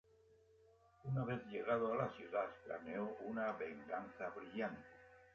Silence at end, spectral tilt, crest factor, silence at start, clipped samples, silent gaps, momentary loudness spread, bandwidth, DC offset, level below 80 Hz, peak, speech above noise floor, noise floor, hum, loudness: 0.05 s; -6 dB/octave; 18 dB; 0.3 s; under 0.1%; none; 10 LU; 6.8 kHz; under 0.1%; -76 dBFS; -26 dBFS; 27 dB; -70 dBFS; none; -44 LUFS